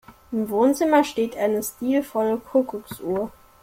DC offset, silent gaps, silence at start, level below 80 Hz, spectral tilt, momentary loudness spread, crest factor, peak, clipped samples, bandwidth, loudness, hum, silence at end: under 0.1%; none; 0.1 s; -58 dBFS; -5 dB/octave; 11 LU; 18 dB; -6 dBFS; under 0.1%; 16.5 kHz; -23 LUFS; none; 0.35 s